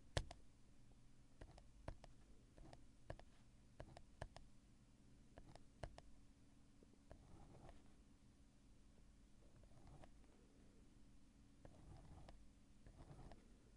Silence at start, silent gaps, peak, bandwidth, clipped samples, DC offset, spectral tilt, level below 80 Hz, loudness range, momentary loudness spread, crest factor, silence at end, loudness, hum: 0 s; none; -22 dBFS; 11 kHz; under 0.1%; under 0.1%; -5 dB/octave; -66 dBFS; 6 LU; 8 LU; 38 dB; 0 s; -62 LUFS; none